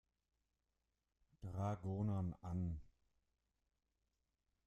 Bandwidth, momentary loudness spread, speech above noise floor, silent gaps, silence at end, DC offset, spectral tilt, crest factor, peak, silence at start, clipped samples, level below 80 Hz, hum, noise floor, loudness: 8.2 kHz; 10 LU; 46 dB; none; 1.8 s; under 0.1%; -9.5 dB/octave; 18 dB; -30 dBFS; 1.4 s; under 0.1%; -66 dBFS; none; -89 dBFS; -45 LUFS